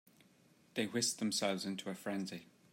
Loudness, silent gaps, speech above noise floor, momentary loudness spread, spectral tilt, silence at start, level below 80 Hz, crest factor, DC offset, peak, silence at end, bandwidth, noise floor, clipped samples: -38 LUFS; none; 29 dB; 10 LU; -3 dB/octave; 0.75 s; -86 dBFS; 20 dB; under 0.1%; -20 dBFS; 0.3 s; 16 kHz; -68 dBFS; under 0.1%